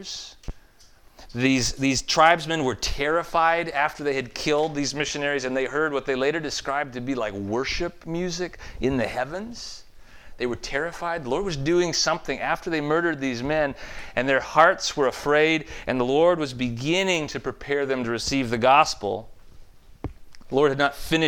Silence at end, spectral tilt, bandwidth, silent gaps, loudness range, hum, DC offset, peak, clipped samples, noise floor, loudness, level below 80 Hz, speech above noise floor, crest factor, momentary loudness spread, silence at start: 0 s; -4 dB/octave; 19 kHz; none; 7 LU; none; under 0.1%; -2 dBFS; under 0.1%; -52 dBFS; -24 LUFS; -44 dBFS; 28 dB; 22 dB; 13 LU; 0 s